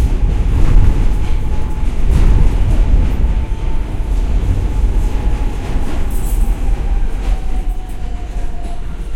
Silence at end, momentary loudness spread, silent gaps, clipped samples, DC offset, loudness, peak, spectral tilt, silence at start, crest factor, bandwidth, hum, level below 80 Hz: 0 s; 11 LU; none; under 0.1%; under 0.1%; -19 LUFS; 0 dBFS; -7 dB/octave; 0 s; 12 dB; 13 kHz; none; -14 dBFS